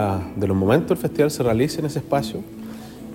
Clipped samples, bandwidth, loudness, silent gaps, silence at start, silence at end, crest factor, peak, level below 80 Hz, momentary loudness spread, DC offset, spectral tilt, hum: under 0.1%; 16.5 kHz; -21 LUFS; none; 0 s; 0 s; 18 dB; -4 dBFS; -48 dBFS; 17 LU; under 0.1%; -6.5 dB/octave; none